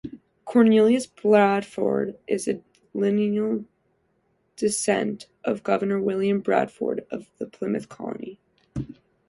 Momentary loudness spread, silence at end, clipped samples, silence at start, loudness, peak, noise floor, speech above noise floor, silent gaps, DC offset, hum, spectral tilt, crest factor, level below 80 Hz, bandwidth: 17 LU; 0.35 s; under 0.1%; 0.05 s; -24 LUFS; -4 dBFS; -69 dBFS; 46 dB; none; under 0.1%; none; -5.5 dB/octave; 20 dB; -60 dBFS; 11.5 kHz